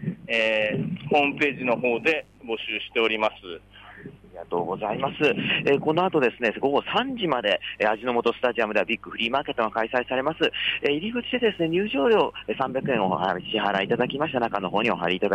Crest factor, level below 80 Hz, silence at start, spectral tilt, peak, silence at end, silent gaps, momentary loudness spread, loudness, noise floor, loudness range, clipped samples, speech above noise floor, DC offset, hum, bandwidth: 16 dB; -58 dBFS; 0 s; -6 dB/octave; -10 dBFS; 0 s; none; 7 LU; -24 LUFS; -44 dBFS; 3 LU; under 0.1%; 20 dB; under 0.1%; none; 9.2 kHz